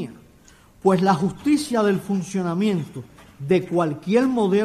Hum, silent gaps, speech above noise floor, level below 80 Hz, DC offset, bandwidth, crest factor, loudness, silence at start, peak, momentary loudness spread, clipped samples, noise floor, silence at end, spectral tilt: none; none; 31 dB; -56 dBFS; under 0.1%; 14 kHz; 16 dB; -21 LUFS; 0 s; -6 dBFS; 11 LU; under 0.1%; -51 dBFS; 0 s; -6.5 dB/octave